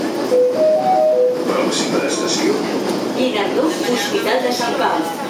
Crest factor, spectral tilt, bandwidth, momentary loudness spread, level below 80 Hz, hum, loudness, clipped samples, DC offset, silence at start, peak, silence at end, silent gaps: 12 dB; -3.5 dB/octave; 16.5 kHz; 4 LU; -62 dBFS; none; -17 LUFS; under 0.1%; under 0.1%; 0 s; -4 dBFS; 0 s; none